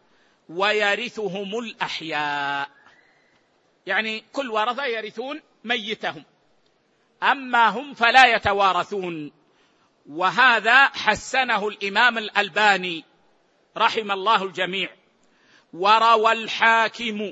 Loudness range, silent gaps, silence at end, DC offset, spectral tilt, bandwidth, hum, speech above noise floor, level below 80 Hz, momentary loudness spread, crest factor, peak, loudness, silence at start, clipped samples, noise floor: 9 LU; none; 0 s; under 0.1%; -3 dB/octave; 8.6 kHz; none; 43 dB; -62 dBFS; 15 LU; 22 dB; 0 dBFS; -20 LUFS; 0.5 s; under 0.1%; -64 dBFS